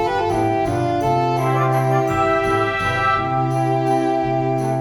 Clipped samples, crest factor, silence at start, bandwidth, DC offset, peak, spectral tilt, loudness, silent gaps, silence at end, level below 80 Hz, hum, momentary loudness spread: under 0.1%; 14 dB; 0 s; 17 kHz; under 0.1%; -6 dBFS; -7 dB/octave; -19 LUFS; none; 0 s; -42 dBFS; none; 2 LU